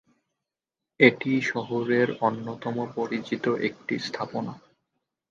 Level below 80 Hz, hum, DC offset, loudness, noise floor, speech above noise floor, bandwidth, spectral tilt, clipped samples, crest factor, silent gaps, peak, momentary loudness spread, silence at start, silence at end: -72 dBFS; none; under 0.1%; -26 LUFS; -88 dBFS; 63 dB; 7.6 kHz; -6 dB/octave; under 0.1%; 24 dB; none; -4 dBFS; 12 LU; 1 s; 0.75 s